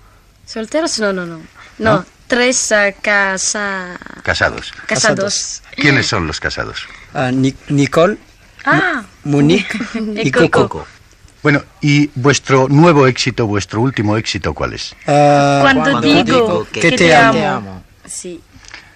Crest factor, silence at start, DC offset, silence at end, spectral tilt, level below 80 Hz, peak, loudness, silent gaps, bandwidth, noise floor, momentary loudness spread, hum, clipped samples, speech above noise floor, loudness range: 14 dB; 0.5 s; under 0.1%; 0.15 s; -4.5 dB/octave; -42 dBFS; 0 dBFS; -13 LUFS; none; 13 kHz; -43 dBFS; 14 LU; none; under 0.1%; 30 dB; 4 LU